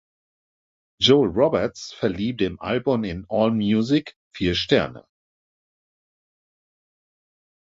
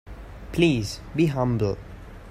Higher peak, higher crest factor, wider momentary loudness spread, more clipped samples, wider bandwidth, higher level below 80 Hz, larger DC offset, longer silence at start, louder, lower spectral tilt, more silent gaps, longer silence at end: first, -2 dBFS vs -6 dBFS; about the same, 22 dB vs 18 dB; second, 9 LU vs 21 LU; neither; second, 7.8 kHz vs 15.5 kHz; second, -48 dBFS vs -42 dBFS; neither; first, 1 s vs 0.05 s; about the same, -22 LUFS vs -24 LUFS; about the same, -6 dB/octave vs -6.5 dB/octave; first, 4.16-4.31 s vs none; first, 2.75 s vs 0 s